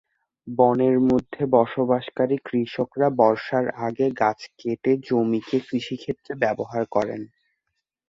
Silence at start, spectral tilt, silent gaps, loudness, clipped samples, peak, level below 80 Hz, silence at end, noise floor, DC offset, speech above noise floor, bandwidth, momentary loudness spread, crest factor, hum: 0.45 s; -7.5 dB/octave; none; -23 LUFS; under 0.1%; -2 dBFS; -60 dBFS; 0.85 s; -79 dBFS; under 0.1%; 57 dB; 7.6 kHz; 11 LU; 20 dB; none